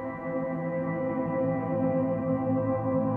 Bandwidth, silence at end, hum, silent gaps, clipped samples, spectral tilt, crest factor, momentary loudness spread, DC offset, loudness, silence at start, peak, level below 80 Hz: 3.1 kHz; 0 s; none; none; under 0.1%; -12 dB/octave; 12 dB; 4 LU; under 0.1%; -29 LUFS; 0 s; -16 dBFS; -60 dBFS